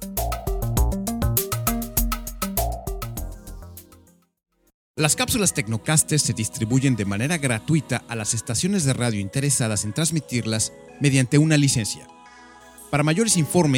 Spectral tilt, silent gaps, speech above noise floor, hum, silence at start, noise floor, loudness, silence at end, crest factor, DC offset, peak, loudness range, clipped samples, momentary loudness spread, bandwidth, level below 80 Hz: -4.5 dB/octave; 4.74-4.94 s; 33 dB; none; 0 s; -54 dBFS; -22 LUFS; 0 s; 22 dB; under 0.1%; 0 dBFS; 6 LU; under 0.1%; 11 LU; over 20 kHz; -34 dBFS